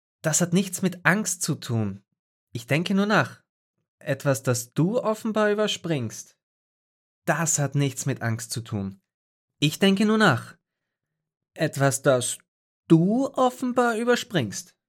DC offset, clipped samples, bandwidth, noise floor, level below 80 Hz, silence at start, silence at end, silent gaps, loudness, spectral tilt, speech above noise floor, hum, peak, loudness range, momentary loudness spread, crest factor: under 0.1%; under 0.1%; 17 kHz; -84 dBFS; -74 dBFS; 0.25 s; 0.25 s; 2.19-2.47 s, 3.49-3.74 s, 3.88-3.98 s, 6.43-7.22 s, 9.14-9.48 s, 12.48-12.83 s; -24 LUFS; -4.5 dB/octave; 60 dB; none; -4 dBFS; 4 LU; 12 LU; 22 dB